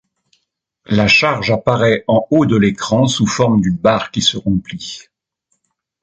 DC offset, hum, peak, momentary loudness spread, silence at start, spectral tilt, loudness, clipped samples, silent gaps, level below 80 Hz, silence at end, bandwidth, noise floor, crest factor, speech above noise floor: under 0.1%; none; 0 dBFS; 9 LU; 0.9 s; -5 dB/octave; -14 LUFS; under 0.1%; none; -42 dBFS; 1 s; 9 kHz; -69 dBFS; 14 dB; 55 dB